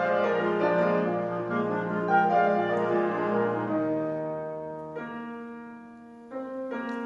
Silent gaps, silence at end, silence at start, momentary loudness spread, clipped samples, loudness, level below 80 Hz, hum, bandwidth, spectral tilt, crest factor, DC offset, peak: none; 0 s; 0 s; 17 LU; under 0.1%; -27 LUFS; -70 dBFS; none; 7.4 kHz; -8 dB/octave; 16 dB; under 0.1%; -12 dBFS